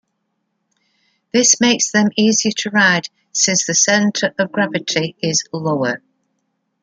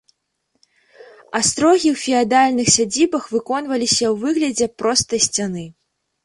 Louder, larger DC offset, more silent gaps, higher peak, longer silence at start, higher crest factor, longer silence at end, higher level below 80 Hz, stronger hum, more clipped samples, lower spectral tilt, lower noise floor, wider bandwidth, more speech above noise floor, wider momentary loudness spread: about the same, -15 LUFS vs -17 LUFS; neither; neither; about the same, 0 dBFS vs 0 dBFS; first, 1.35 s vs 1 s; about the same, 18 dB vs 18 dB; first, 0.85 s vs 0.55 s; second, -64 dBFS vs -54 dBFS; neither; neither; about the same, -2.5 dB/octave vs -2.5 dB/octave; about the same, -71 dBFS vs -71 dBFS; second, 10 kHz vs 11.5 kHz; about the same, 55 dB vs 53 dB; about the same, 8 LU vs 8 LU